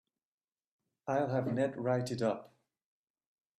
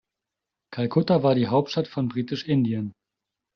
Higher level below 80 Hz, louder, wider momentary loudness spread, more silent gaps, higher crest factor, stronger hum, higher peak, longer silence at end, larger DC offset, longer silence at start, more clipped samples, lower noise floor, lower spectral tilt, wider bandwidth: second, -76 dBFS vs -62 dBFS; second, -34 LUFS vs -24 LUFS; second, 6 LU vs 10 LU; neither; about the same, 18 dB vs 16 dB; neither; second, -20 dBFS vs -8 dBFS; first, 1.1 s vs 0.65 s; neither; first, 1.05 s vs 0.7 s; neither; first, under -90 dBFS vs -86 dBFS; about the same, -7 dB/octave vs -6.5 dB/octave; first, 13 kHz vs 6.8 kHz